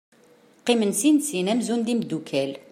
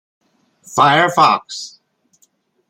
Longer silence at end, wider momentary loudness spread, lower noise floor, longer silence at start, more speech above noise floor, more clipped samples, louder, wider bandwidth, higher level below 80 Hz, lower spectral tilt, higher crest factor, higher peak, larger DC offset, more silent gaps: second, 0.1 s vs 1 s; second, 7 LU vs 17 LU; second, -56 dBFS vs -60 dBFS; about the same, 0.65 s vs 0.7 s; second, 33 dB vs 46 dB; neither; second, -23 LUFS vs -13 LUFS; about the same, 15.5 kHz vs 16 kHz; second, -74 dBFS vs -62 dBFS; about the same, -4 dB/octave vs -3.5 dB/octave; about the same, 18 dB vs 18 dB; second, -6 dBFS vs 0 dBFS; neither; neither